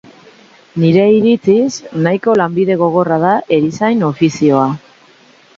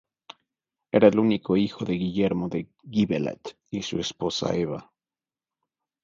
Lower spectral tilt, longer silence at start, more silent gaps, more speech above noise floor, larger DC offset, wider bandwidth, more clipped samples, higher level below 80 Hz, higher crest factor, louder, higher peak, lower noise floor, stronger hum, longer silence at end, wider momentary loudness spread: about the same, -7 dB/octave vs -6 dB/octave; second, 0.75 s vs 0.95 s; neither; second, 34 dB vs over 66 dB; neither; about the same, 7.8 kHz vs 7.6 kHz; neither; about the same, -56 dBFS vs -56 dBFS; second, 12 dB vs 22 dB; first, -13 LUFS vs -25 LUFS; first, 0 dBFS vs -4 dBFS; second, -46 dBFS vs under -90 dBFS; neither; second, 0.8 s vs 1.2 s; second, 7 LU vs 14 LU